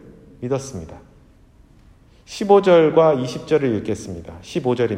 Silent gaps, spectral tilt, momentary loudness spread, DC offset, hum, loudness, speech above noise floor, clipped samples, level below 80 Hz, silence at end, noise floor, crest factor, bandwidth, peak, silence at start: none; -6.5 dB/octave; 21 LU; under 0.1%; none; -18 LUFS; 32 dB; under 0.1%; -52 dBFS; 0 s; -50 dBFS; 20 dB; 11 kHz; 0 dBFS; 0.4 s